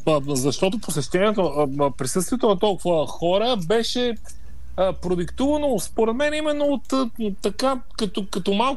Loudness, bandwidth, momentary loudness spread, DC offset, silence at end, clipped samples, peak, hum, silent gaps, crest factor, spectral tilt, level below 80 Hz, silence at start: -23 LUFS; 12.5 kHz; 6 LU; 3%; 0 s; under 0.1%; -8 dBFS; none; none; 16 dB; -4.5 dB/octave; -42 dBFS; 0 s